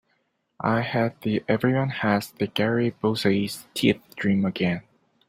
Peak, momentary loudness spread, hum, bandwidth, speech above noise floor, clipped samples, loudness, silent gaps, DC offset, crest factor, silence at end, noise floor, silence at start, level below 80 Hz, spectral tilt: -6 dBFS; 4 LU; none; 16 kHz; 48 dB; under 0.1%; -25 LUFS; none; under 0.1%; 20 dB; 0.5 s; -71 dBFS; 0.6 s; -60 dBFS; -6 dB/octave